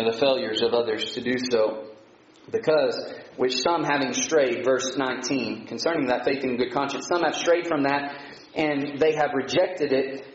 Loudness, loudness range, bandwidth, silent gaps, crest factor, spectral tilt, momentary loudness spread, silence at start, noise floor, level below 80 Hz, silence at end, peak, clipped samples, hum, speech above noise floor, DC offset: -24 LUFS; 1 LU; 8 kHz; none; 16 dB; -2.5 dB/octave; 6 LU; 0 s; -52 dBFS; -64 dBFS; 0 s; -10 dBFS; under 0.1%; none; 28 dB; under 0.1%